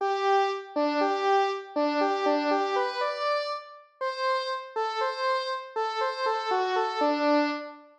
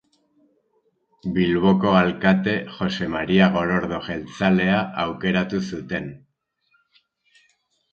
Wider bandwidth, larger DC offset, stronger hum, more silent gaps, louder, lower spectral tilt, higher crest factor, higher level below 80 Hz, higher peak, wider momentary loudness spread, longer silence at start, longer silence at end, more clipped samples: first, 9.4 kHz vs 6.8 kHz; neither; neither; neither; second, -27 LUFS vs -21 LUFS; second, -1.5 dB/octave vs -7 dB/octave; second, 12 dB vs 22 dB; second, under -90 dBFS vs -50 dBFS; second, -14 dBFS vs -2 dBFS; second, 7 LU vs 11 LU; second, 0 s vs 1.25 s; second, 0.15 s vs 1.75 s; neither